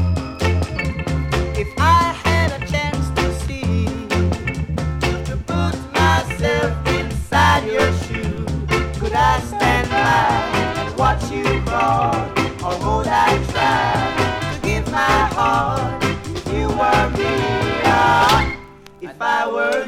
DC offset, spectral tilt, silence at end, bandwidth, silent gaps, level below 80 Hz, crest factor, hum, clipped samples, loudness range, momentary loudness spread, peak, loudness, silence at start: under 0.1%; -5.5 dB/octave; 0 s; 16 kHz; none; -28 dBFS; 16 dB; none; under 0.1%; 3 LU; 8 LU; -2 dBFS; -18 LUFS; 0 s